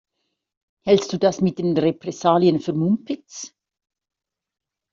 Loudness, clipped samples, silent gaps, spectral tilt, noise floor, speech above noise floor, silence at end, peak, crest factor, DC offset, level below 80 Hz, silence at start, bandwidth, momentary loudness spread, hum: -20 LUFS; under 0.1%; none; -6.5 dB/octave; -77 dBFS; 57 dB; 1.45 s; -4 dBFS; 18 dB; under 0.1%; -62 dBFS; 0.85 s; 7.6 kHz; 14 LU; none